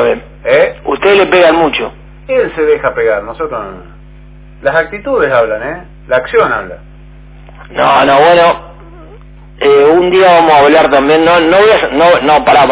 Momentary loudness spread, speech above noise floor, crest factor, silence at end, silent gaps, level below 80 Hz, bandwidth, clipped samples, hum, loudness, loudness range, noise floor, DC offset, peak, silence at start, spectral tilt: 13 LU; 26 dB; 10 dB; 0 s; none; -36 dBFS; 4 kHz; 0.4%; 50 Hz at -35 dBFS; -9 LUFS; 8 LU; -34 dBFS; under 0.1%; 0 dBFS; 0 s; -8.5 dB/octave